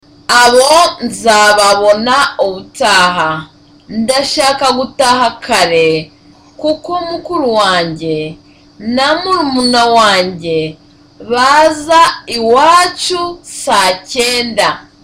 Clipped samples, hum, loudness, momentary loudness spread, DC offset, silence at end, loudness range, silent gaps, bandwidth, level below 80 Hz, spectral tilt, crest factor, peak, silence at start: under 0.1%; none; -10 LUFS; 11 LU; under 0.1%; 0.2 s; 4 LU; none; 17 kHz; -44 dBFS; -2.5 dB/octave; 12 dB; 0 dBFS; 0.3 s